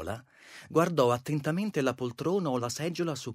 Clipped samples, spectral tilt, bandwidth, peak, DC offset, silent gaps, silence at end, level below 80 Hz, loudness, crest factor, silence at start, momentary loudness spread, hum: under 0.1%; -6 dB/octave; 16 kHz; -10 dBFS; under 0.1%; none; 0 s; -64 dBFS; -30 LUFS; 20 dB; 0 s; 14 LU; none